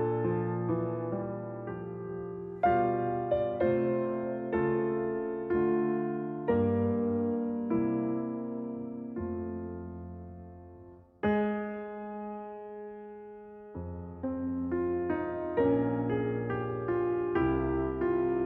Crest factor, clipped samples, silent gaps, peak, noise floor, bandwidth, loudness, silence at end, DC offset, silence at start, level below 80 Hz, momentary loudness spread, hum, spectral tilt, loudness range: 16 dB; under 0.1%; none; -14 dBFS; -53 dBFS; 3.8 kHz; -32 LUFS; 0 s; under 0.1%; 0 s; -54 dBFS; 15 LU; none; -8 dB/octave; 6 LU